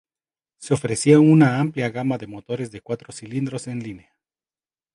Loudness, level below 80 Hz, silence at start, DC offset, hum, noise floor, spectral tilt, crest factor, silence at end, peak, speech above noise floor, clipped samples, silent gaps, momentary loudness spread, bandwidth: -20 LUFS; -60 dBFS; 0.6 s; under 0.1%; none; under -90 dBFS; -6.5 dB/octave; 20 dB; 0.95 s; -2 dBFS; over 70 dB; under 0.1%; none; 17 LU; 11.5 kHz